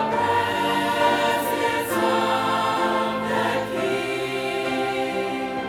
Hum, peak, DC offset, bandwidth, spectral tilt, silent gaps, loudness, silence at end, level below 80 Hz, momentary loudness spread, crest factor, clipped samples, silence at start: none; -8 dBFS; under 0.1%; over 20 kHz; -4 dB/octave; none; -22 LUFS; 0 s; -58 dBFS; 5 LU; 16 dB; under 0.1%; 0 s